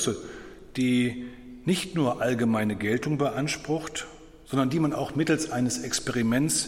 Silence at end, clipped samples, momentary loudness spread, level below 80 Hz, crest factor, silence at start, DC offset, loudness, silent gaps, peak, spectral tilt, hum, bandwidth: 0 s; under 0.1%; 12 LU; -54 dBFS; 16 dB; 0 s; under 0.1%; -27 LUFS; none; -10 dBFS; -4.5 dB/octave; none; 16.5 kHz